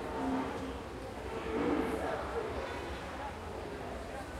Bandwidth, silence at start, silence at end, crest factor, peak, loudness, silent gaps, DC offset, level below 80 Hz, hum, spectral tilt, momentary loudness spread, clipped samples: 16 kHz; 0 s; 0 s; 16 dB; -22 dBFS; -38 LUFS; none; under 0.1%; -50 dBFS; none; -6 dB/octave; 9 LU; under 0.1%